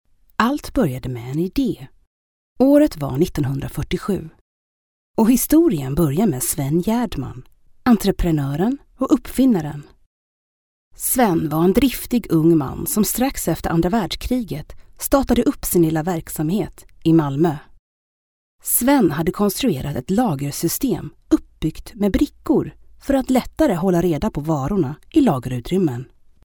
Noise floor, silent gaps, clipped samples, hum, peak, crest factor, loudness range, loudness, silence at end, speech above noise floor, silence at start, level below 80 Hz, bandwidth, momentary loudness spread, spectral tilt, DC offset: under -90 dBFS; 2.07-2.56 s, 4.41-5.14 s, 10.06-10.91 s, 17.79-18.59 s; under 0.1%; none; 0 dBFS; 18 dB; 2 LU; -19 LUFS; 0.4 s; over 71 dB; 0.4 s; -38 dBFS; over 20 kHz; 10 LU; -6 dB/octave; under 0.1%